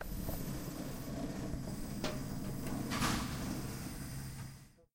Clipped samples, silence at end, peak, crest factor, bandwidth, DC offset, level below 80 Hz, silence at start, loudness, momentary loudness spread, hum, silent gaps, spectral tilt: under 0.1%; 0.15 s; -20 dBFS; 20 dB; 16 kHz; under 0.1%; -48 dBFS; 0 s; -41 LUFS; 9 LU; none; none; -5 dB/octave